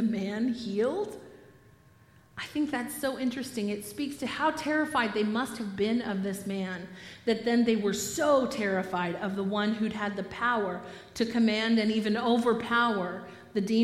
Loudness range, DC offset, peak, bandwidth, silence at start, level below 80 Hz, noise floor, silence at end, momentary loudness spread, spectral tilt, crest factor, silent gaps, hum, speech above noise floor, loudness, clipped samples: 6 LU; under 0.1%; -12 dBFS; 15.5 kHz; 0 s; -64 dBFS; -58 dBFS; 0 s; 10 LU; -5 dB/octave; 16 dB; none; none; 30 dB; -29 LUFS; under 0.1%